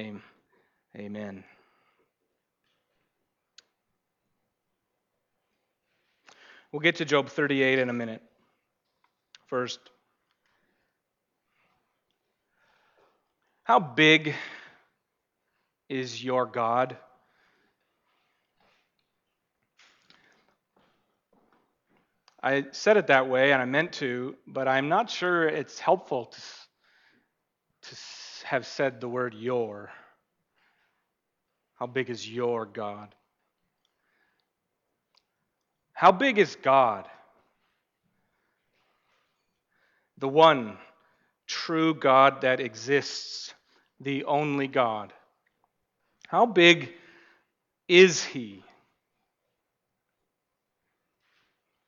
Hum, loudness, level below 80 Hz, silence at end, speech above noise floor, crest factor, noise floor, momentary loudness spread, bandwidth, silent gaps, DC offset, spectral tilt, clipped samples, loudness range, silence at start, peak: none; -25 LUFS; -80 dBFS; 3.3 s; 57 dB; 24 dB; -82 dBFS; 21 LU; 7.6 kHz; none; under 0.1%; -4.5 dB/octave; under 0.1%; 14 LU; 0 s; -6 dBFS